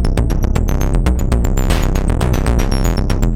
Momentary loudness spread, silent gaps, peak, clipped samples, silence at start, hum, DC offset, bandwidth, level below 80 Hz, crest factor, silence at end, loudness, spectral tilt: 1 LU; none; 0 dBFS; under 0.1%; 0 s; none; under 0.1%; 16 kHz; -16 dBFS; 14 dB; 0 s; -17 LUFS; -6 dB/octave